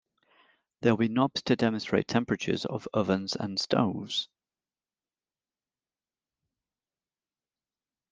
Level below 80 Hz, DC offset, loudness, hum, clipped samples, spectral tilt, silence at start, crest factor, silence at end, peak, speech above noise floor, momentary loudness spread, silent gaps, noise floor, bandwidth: -68 dBFS; under 0.1%; -29 LUFS; none; under 0.1%; -5.5 dB/octave; 0.8 s; 24 dB; 3.85 s; -8 dBFS; over 62 dB; 6 LU; none; under -90 dBFS; 9.4 kHz